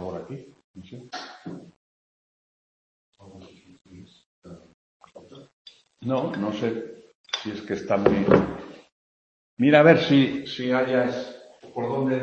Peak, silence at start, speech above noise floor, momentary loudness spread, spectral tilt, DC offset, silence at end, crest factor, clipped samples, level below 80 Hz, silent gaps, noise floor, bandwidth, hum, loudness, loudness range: -2 dBFS; 0 s; 27 dB; 24 LU; -7 dB/octave; under 0.1%; 0 s; 24 dB; under 0.1%; -56 dBFS; 0.64-0.74 s, 1.76-3.13 s, 4.26-4.42 s, 4.74-5.00 s, 5.53-5.65 s, 7.15-7.24 s, 8.92-9.57 s; -49 dBFS; 7.8 kHz; none; -22 LUFS; 23 LU